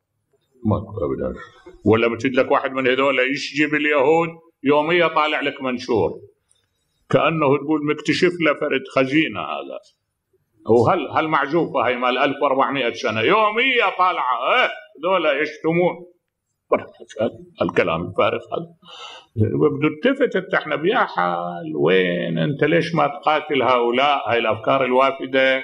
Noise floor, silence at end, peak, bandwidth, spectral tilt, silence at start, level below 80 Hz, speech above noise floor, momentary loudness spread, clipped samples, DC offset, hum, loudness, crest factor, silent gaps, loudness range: -76 dBFS; 0 s; -2 dBFS; 10 kHz; -6 dB/octave; 0.65 s; -54 dBFS; 57 dB; 10 LU; under 0.1%; under 0.1%; none; -19 LUFS; 18 dB; none; 4 LU